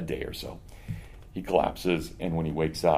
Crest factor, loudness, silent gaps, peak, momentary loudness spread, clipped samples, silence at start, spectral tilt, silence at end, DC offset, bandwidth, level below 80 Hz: 22 dB; -29 LUFS; none; -6 dBFS; 15 LU; under 0.1%; 0 s; -6 dB/octave; 0 s; under 0.1%; 15.5 kHz; -46 dBFS